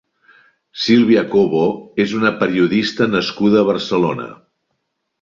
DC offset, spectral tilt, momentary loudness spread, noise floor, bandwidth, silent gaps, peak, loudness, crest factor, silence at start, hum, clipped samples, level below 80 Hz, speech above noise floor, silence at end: under 0.1%; -6 dB/octave; 7 LU; -72 dBFS; 7.6 kHz; none; 0 dBFS; -16 LUFS; 16 dB; 0.75 s; none; under 0.1%; -56 dBFS; 57 dB; 0.85 s